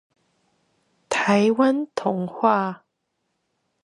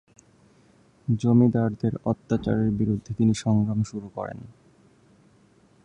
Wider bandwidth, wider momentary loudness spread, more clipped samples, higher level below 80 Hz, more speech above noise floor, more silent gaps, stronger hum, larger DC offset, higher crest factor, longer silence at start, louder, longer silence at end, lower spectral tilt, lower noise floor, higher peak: about the same, 11.5 kHz vs 10.5 kHz; second, 9 LU vs 15 LU; neither; second, -72 dBFS vs -52 dBFS; first, 55 dB vs 35 dB; neither; neither; neither; about the same, 20 dB vs 18 dB; about the same, 1.1 s vs 1.1 s; first, -21 LUFS vs -24 LUFS; second, 1.05 s vs 1.35 s; second, -5.5 dB/octave vs -8 dB/octave; first, -76 dBFS vs -58 dBFS; first, -4 dBFS vs -8 dBFS